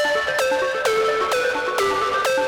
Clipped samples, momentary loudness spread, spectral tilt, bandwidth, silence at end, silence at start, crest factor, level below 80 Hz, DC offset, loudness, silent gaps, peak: under 0.1%; 1 LU; -1.5 dB/octave; over 20 kHz; 0 s; 0 s; 12 dB; -54 dBFS; under 0.1%; -20 LUFS; none; -8 dBFS